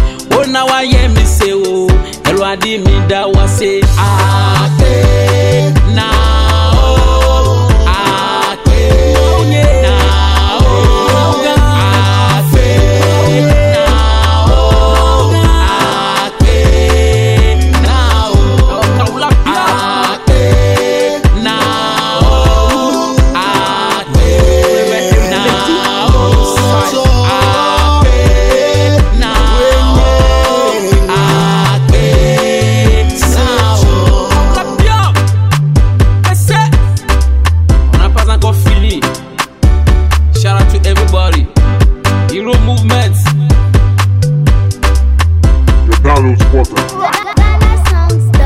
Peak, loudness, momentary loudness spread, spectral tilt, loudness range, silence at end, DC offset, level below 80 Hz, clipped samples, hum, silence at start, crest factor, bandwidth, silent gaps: 0 dBFS; -9 LUFS; 3 LU; -5.5 dB/octave; 2 LU; 0 s; under 0.1%; -12 dBFS; under 0.1%; none; 0 s; 8 dB; 15.5 kHz; none